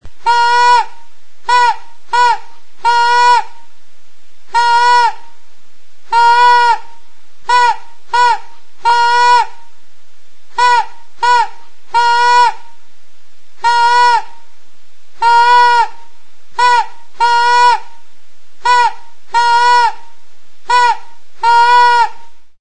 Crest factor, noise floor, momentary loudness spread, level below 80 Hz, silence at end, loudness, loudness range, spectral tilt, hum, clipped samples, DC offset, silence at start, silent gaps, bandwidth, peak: 12 dB; -52 dBFS; 11 LU; -52 dBFS; 0 s; -11 LUFS; 2 LU; 0.5 dB/octave; none; under 0.1%; 10%; 0 s; none; 10 kHz; 0 dBFS